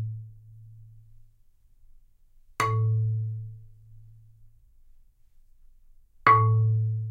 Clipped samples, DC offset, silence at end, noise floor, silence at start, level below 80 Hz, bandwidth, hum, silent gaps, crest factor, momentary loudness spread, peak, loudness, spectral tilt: under 0.1%; under 0.1%; 0 s; -58 dBFS; 0 s; -56 dBFS; 10 kHz; none; none; 24 dB; 23 LU; -4 dBFS; -25 LUFS; -6.5 dB/octave